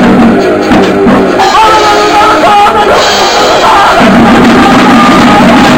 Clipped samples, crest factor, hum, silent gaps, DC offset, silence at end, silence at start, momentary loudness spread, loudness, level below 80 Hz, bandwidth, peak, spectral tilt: 10%; 4 dB; none; none; under 0.1%; 0 s; 0 s; 3 LU; -3 LUFS; -28 dBFS; 17 kHz; 0 dBFS; -4.5 dB/octave